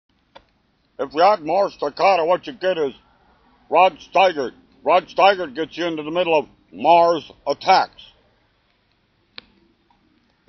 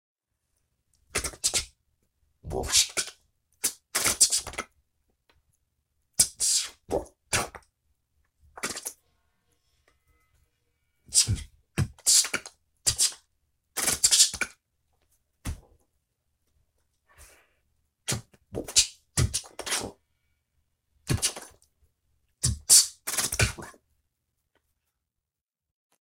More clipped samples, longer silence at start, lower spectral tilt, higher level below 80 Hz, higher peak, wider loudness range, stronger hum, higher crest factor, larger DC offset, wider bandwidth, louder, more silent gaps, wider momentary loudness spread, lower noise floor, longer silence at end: neither; second, 1 s vs 1.15 s; about the same, -1.5 dB/octave vs -1 dB/octave; second, -62 dBFS vs -48 dBFS; about the same, 0 dBFS vs -2 dBFS; second, 2 LU vs 11 LU; neither; second, 20 dB vs 28 dB; neither; second, 6.4 kHz vs 16.5 kHz; first, -19 LUFS vs -24 LUFS; neither; second, 12 LU vs 19 LU; second, -63 dBFS vs -90 dBFS; first, 2.65 s vs 2.35 s